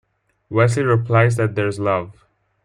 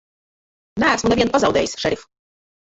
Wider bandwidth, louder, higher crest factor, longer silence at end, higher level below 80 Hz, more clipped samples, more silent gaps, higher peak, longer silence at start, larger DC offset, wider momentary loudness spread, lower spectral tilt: first, 11 kHz vs 8.2 kHz; about the same, -18 LUFS vs -18 LUFS; about the same, 16 dB vs 18 dB; second, 0.55 s vs 0.7 s; second, -56 dBFS vs -46 dBFS; neither; neither; about the same, -2 dBFS vs -4 dBFS; second, 0.5 s vs 0.75 s; neither; about the same, 8 LU vs 10 LU; first, -7 dB/octave vs -4 dB/octave